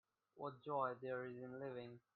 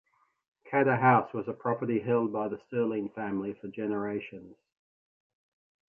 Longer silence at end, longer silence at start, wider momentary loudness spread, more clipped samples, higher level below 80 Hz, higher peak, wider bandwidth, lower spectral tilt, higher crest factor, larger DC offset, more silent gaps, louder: second, 0.15 s vs 1.4 s; second, 0.35 s vs 0.65 s; second, 9 LU vs 13 LU; neither; second, -88 dBFS vs -72 dBFS; second, -28 dBFS vs -10 dBFS; about the same, 4.5 kHz vs 4.6 kHz; second, -8.5 dB/octave vs -10.5 dB/octave; about the same, 20 dB vs 20 dB; neither; neither; second, -48 LUFS vs -30 LUFS